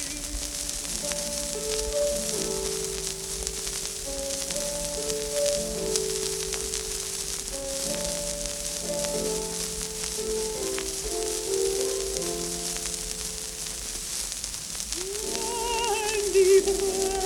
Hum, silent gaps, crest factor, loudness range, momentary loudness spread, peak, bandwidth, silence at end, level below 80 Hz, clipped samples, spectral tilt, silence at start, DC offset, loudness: none; none; 26 dB; 2 LU; 5 LU; -2 dBFS; 19 kHz; 0 s; -44 dBFS; under 0.1%; -2 dB/octave; 0 s; under 0.1%; -28 LUFS